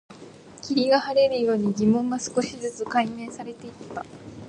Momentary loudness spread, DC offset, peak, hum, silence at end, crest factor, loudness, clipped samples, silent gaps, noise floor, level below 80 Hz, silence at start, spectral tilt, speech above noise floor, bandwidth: 18 LU; under 0.1%; -10 dBFS; none; 0 s; 16 dB; -23 LUFS; under 0.1%; none; -45 dBFS; -60 dBFS; 0.1 s; -5 dB/octave; 21 dB; 10.5 kHz